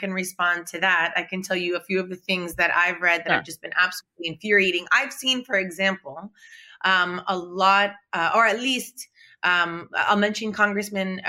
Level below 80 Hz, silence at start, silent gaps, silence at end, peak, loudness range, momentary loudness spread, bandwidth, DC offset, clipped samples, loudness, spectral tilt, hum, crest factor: -64 dBFS; 0 s; none; 0 s; -4 dBFS; 1 LU; 9 LU; 16 kHz; under 0.1%; under 0.1%; -22 LUFS; -3 dB/octave; none; 20 dB